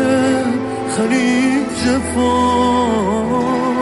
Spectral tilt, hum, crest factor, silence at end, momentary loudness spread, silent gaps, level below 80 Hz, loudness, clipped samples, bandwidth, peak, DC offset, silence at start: -5 dB/octave; none; 12 dB; 0 s; 4 LU; none; -38 dBFS; -16 LUFS; under 0.1%; 11.5 kHz; -4 dBFS; under 0.1%; 0 s